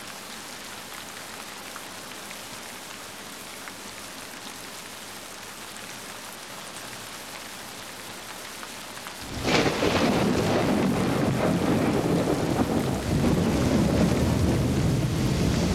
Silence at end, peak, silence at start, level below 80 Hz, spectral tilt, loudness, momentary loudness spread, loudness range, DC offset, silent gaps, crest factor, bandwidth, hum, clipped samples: 0 s; -8 dBFS; 0 s; -42 dBFS; -5.5 dB/octave; -27 LUFS; 14 LU; 13 LU; 0.1%; none; 18 dB; 16.5 kHz; none; under 0.1%